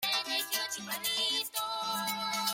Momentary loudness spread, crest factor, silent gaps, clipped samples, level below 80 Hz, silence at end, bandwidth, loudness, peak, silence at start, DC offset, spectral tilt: 4 LU; 16 dB; none; under 0.1%; -78 dBFS; 0 s; 16.5 kHz; -31 LUFS; -18 dBFS; 0 s; under 0.1%; 0 dB/octave